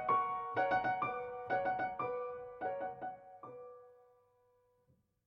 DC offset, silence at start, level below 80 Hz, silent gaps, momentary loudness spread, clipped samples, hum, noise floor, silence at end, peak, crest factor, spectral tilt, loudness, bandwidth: under 0.1%; 0 s; -74 dBFS; none; 19 LU; under 0.1%; none; -75 dBFS; 1.3 s; -22 dBFS; 18 dB; -7 dB/octave; -38 LUFS; 6.6 kHz